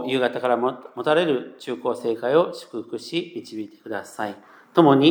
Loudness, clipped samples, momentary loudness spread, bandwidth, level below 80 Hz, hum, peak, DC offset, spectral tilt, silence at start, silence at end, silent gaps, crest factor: -23 LUFS; under 0.1%; 15 LU; 19.5 kHz; -86 dBFS; none; -2 dBFS; under 0.1%; -6 dB/octave; 0 s; 0 s; none; 20 dB